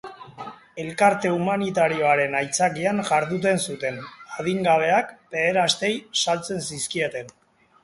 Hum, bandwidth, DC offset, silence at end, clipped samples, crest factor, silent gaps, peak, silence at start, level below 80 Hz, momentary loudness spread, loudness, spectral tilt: none; 11.5 kHz; under 0.1%; 0.55 s; under 0.1%; 18 dB; none; -6 dBFS; 0.05 s; -64 dBFS; 16 LU; -22 LUFS; -3.5 dB/octave